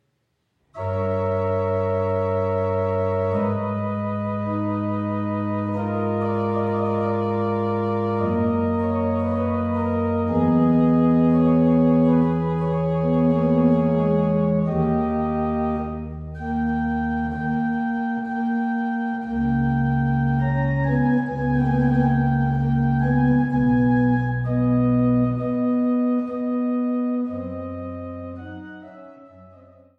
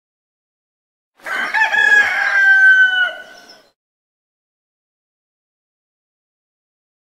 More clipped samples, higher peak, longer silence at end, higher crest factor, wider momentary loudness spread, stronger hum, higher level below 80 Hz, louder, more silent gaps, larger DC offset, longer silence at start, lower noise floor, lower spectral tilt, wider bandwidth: neither; second, -6 dBFS vs -2 dBFS; second, 0.5 s vs 3.8 s; about the same, 14 dB vs 16 dB; second, 8 LU vs 12 LU; neither; first, -42 dBFS vs -68 dBFS; second, -22 LUFS vs -11 LUFS; neither; neither; second, 0.75 s vs 1.25 s; first, -71 dBFS vs -43 dBFS; first, -11 dB/octave vs 0.5 dB/octave; second, 4.6 kHz vs 14 kHz